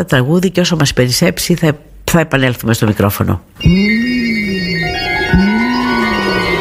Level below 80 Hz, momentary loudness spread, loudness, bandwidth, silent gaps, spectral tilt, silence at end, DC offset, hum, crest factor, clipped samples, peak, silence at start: -30 dBFS; 4 LU; -13 LUFS; 16 kHz; none; -5 dB/octave; 0 s; under 0.1%; none; 12 dB; under 0.1%; 0 dBFS; 0 s